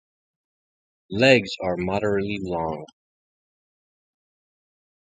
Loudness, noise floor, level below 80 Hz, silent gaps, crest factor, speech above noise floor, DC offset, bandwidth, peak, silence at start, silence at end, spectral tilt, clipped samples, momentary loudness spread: -22 LUFS; under -90 dBFS; -52 dBFS; none; 24 dB; over 68 dB; under 0.1%; 9.4 kHz; -2 dBFS; 1.1 s; 2.2 s; -5.5 dB/octave; under 0.1%; 14 LU